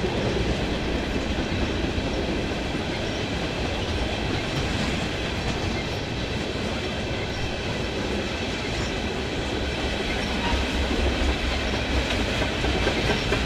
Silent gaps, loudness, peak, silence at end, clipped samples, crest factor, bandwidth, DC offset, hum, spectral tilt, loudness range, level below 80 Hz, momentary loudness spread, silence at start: none; -26 LUFS; -10 dBFS; 0 s; under 0.1%; 16 dB; 14 kHz; under 0.1%; none; -5 dB/octave; 3 LU; -32 dBFS; 4 LU; 0 s